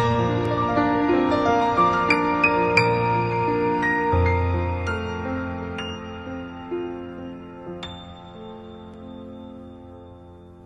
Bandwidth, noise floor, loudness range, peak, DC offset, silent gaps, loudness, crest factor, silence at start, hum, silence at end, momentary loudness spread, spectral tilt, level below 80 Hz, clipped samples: 10.5 kHz; -44 dBFS; 17 LU; -2 dBFS; under 0.1%; none; -22 LUFS; 22 dB; 0 s; none; 0 s; 21 LU; -7 dB/octave; -42 dBFS; under 0.1%